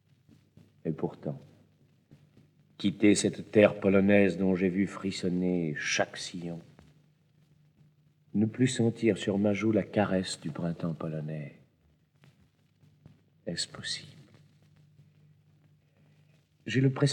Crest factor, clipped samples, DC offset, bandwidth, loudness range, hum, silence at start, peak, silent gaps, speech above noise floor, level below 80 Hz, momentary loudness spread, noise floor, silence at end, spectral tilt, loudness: 22 dB; under 0.1%; under 0.1%; 11 kHz; 15 LU; none; 0.85 s; -8 dBFS; none; 39 dB; -72 dBFS; 16 LU; -67 dBFS; 0 s; -5.5 dB/octave; -29 LUFS